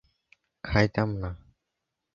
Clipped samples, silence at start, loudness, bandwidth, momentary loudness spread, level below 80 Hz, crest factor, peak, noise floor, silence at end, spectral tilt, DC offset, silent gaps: under 0.1%; 0.65 s; -28 LUFS; 7.2 kHz; 19 LU; -44 dBFS; 24 dB; -6 dBFS; -84 dBFS; 0.75 s; -7 dB/octave; under 0.1%; none